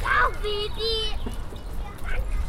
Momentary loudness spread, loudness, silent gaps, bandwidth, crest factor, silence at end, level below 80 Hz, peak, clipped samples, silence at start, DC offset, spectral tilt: 15 LU; -28 LUFS; none; 15 kHz; 16 dB; 0 s; -30 dBFS; -10 dBFS; under 0.1%; 0 s; under 0.1%; -4 dB/octave